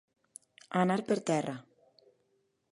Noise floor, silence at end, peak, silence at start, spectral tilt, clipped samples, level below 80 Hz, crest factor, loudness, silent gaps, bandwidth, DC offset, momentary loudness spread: -76 dBFS; 1.1 s; -14 dBFS; 0.7 s; -6 dB/octave; under 0.1%; -80 dBFS; 22 dB; -32 LUFS; none; 11.5 kHz; under 0.1%; 24 LU